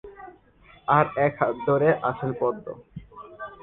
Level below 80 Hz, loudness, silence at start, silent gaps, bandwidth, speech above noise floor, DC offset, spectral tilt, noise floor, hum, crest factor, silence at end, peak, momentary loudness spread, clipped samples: -58 dBFS; -23 LUFS; 0.05 s; none; 4.1 kHz; 31 dB; under 0.1%; -10.5 dB/octave; -54 dBFS; none; 22 dB; 0.1 s; -4 dBFS; 22 LU; under 0.1%